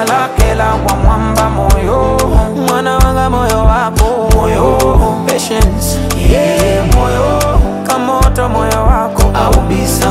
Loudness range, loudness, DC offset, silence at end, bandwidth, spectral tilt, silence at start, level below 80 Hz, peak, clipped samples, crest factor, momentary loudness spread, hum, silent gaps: 1 LU; -11 LUFS; under 0.1%; 0 s; 16 kHz; -5.5 dB/octave; 0 s; -14 dBFS; 0 dBFS; under 0.1%; 10 dB; 3 LU; none; none